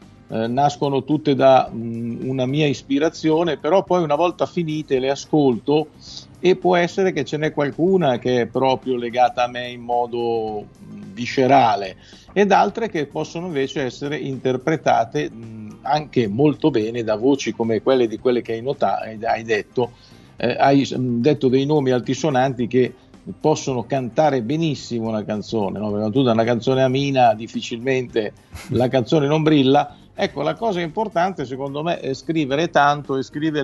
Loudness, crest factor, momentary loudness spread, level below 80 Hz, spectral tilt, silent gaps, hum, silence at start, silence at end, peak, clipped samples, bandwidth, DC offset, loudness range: -20 LUFS; 18 dB; 10 LU; -54 dBFS; -6 dB/octave; none; none; 0.3 s; 0 s; -2 dBFS; under 0.1%; 11.5 kHz; under 0.1%; 2 LU